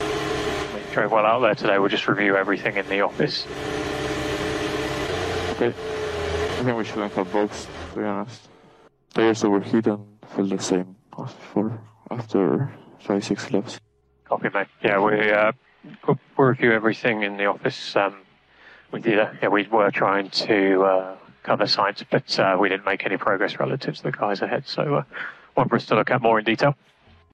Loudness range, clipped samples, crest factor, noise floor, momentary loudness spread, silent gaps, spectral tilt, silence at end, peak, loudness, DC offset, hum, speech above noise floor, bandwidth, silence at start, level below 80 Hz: 5 LU; under 0.1%; 16 dB; -54 dBFS; 11 LU; none; -5.5 dB/octave; 0.6 s; -6 dBFS; -23 LUFS; under 0.1%; none; 32 dB; 13.5 kHz; 0 s; -50 dBFS